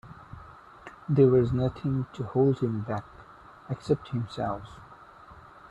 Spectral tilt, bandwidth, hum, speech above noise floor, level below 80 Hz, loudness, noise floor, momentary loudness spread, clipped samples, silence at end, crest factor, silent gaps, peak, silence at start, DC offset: -9.5 dB/octave; 8.4 kHz; none; 24 dB; -54 dBFS; -27 LUFS; -50 dBFS; 26 LU; under 0.1%; 0.3 s; 20 dB; none; -8 dBFS; 0.05 s; under 0.1%